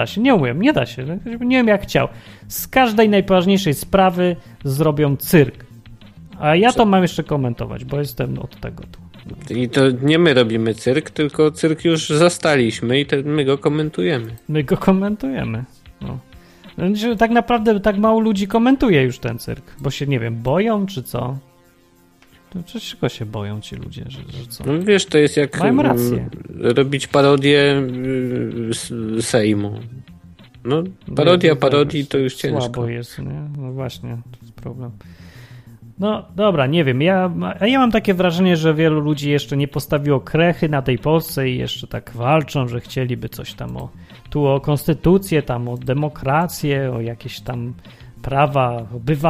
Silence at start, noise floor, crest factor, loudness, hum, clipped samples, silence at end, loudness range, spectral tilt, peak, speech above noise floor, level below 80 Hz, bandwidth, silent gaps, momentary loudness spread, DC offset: 0 s; -53 dBFS; 18 dB; -18 LUFS; none; under 0.1%; 0 s; 7 LU; -6 dB/octave; 0 dBFS; 35 dB; -42 dBFS; 15.5 kHz; none; 16 LU; under 0.1%